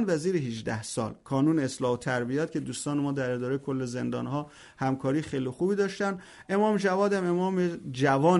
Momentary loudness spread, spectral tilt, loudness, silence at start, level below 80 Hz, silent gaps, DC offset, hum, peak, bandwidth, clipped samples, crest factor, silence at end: 8 LU; -6 dB/octave; -29 LUFS; 0 s; -64 dBFS; none; under 0.1%; none; -10 dBFS; 11.5 kHz; under 0.1%; 16 dB; 0 s